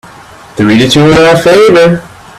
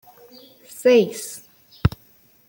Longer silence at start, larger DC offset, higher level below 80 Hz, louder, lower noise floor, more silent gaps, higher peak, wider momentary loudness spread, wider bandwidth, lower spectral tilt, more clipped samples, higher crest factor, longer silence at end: second, 0.55 s vs 0.8 s; neither; first, -36 dBFS vs -42 dBFS; first, -5 LUFS vs -20 LUFS; second, -32 dBFS vs -55 dBFS; neither; about the same, 0 dBFS vs -2 dBFS; second, 9 LU vs 21 LU; second, 14.5 kHz vs 17 kHz; about the same, -5.5 dB/octave vs -5.5 dB/octave; first, 0.5% vs under 0.1%; second, 6 dB vs 20 dB; second, 0.3 s vs 0.6 s